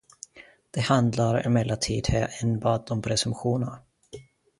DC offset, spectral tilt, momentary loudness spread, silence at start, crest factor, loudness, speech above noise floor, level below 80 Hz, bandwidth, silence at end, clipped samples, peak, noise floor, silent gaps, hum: under 0.1%; -5.5 dB/octave; 22 LU; 0.35 s; 20 dB; -26 LUFS; 23 dB; -46 dBFS; 11.5 kHz; 0.4 s; under 0.1%; -6 dBFS; -48 dBFS; none; none